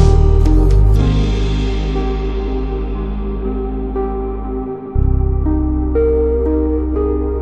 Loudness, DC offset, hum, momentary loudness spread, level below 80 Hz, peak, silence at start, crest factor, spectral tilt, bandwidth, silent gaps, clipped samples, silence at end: -17 LUFS; under 0.1%; none; 9 LU; -16 dBFS; -2 dBFS; 0 s; 12 dB; -8.5 dB/octave; 7.4 kHz; none; under 0.1%; 0 s